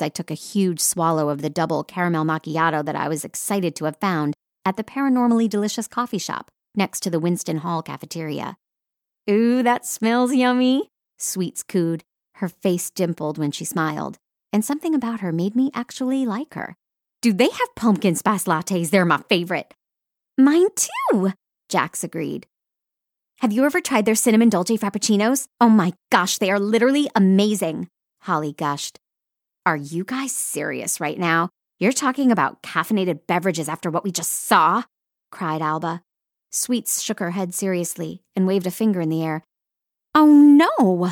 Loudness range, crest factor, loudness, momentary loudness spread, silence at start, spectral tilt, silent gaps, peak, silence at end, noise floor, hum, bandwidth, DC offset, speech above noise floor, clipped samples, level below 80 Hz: 6 LU; 18 dB; -21 LUFS; 12 LU; 0 s; -4.5 dB/octave; none; -4 dBFS; 0 s; -85 dBFS; none; 17.5 kHz; under 0.1%; 65 dB; under 0.1%; -70 dBFS